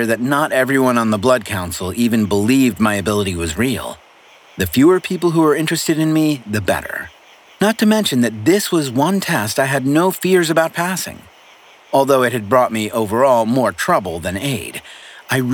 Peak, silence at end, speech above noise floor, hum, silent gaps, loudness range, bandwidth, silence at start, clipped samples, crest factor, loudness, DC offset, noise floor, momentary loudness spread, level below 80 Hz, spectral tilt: -2 dBFS; 0 s; 30 dB; none; none; 1 LU; 20 kHz; 0 s; under 0.1%; 16 dB; -16 LUFS; under 0.1%; -46 dBFS; 9 LU; -46 dBFS; -5 dB/octave